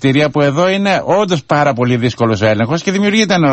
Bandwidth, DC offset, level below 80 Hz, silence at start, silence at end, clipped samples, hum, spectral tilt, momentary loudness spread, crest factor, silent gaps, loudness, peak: 8.4 kHz; under 0.1%; -46 dBFS; 0 s; 0 s; under 0.1%; none; -5.5 dB/octave; 3 LU; 12 dB; none; -13 LUFS; 0 dBFS